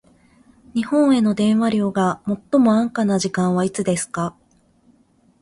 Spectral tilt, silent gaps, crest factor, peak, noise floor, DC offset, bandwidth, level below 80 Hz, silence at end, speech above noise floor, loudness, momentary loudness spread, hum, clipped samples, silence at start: -6 dB/octave; none; 16 dB; -4 dBFS; -58 dBFS; under 0.1%; 11.5 kHz; -58 dBFS; 1.1 s; 39 dB; -19 LUFS; 10 LU; none; under 0.1%; 0.75 s